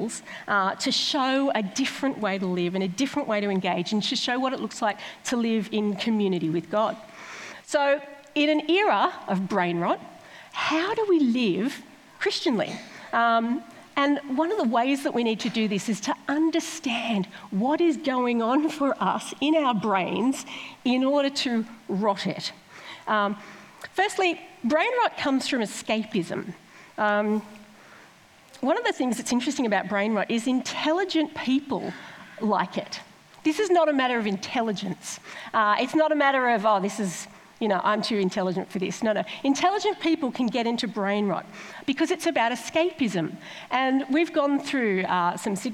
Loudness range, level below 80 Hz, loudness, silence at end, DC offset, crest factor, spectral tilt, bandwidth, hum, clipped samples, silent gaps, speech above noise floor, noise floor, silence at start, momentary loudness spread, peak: 3 LU; -72 dBFS; -25 LUFS; 0 s; under 0.1%; 16 dB; -4.5 dB/octave; 15 kHz; none; under 0.1%; none; 28 dB; -53 dBFS; 0 s; 10 LU; -10 dBFS